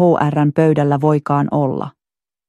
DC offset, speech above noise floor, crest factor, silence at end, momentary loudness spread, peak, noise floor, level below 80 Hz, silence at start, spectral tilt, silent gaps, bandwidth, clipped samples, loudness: under 0.1%; over 75 dB; 14 dB; 0.6 s; 8 LU; -2 dBFS; under -90 dBFS; -54 dBFS; 0 s; -9.5 dB/octave; none; 8.2 kHz; under 0.1%; -16 LUFS